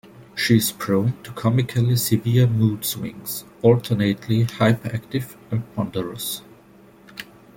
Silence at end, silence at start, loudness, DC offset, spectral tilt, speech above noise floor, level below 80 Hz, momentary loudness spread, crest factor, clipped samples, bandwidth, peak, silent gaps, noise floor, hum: 0.35 s; 0.2 s; -22 LUFS; under 0.1%; -6 dB/octave; 29 dB; -54 dBFS; 12 LU; 20 dB; under 0.1%; 17 kHz; -2 dBFS; none; -49 dBFS; none